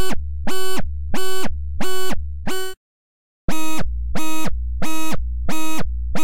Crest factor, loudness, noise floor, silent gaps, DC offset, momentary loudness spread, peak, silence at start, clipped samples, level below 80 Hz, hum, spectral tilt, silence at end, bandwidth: 6 dB; -27 LUFS; under -90 dBFS; 2.77-3.48 s; 10%; 3 LU; -6 dBFS; 0 s; under 0.1%; -28 dBFS; none; -4.5 dB/octave; 0 s; 16 kHz